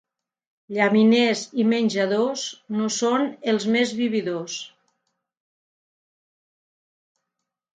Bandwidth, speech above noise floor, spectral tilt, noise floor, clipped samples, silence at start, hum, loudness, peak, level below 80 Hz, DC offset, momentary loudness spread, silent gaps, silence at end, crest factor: 9.2 kHz; 61 dB; -4.5 dB/octave; -83 dBFS; under 0.1%; 0.7 s; none; -22 LUFS; -6 dBFS; -74 dBFS; under 0.1%; 13 LU; none; 3.1 s; 18 dB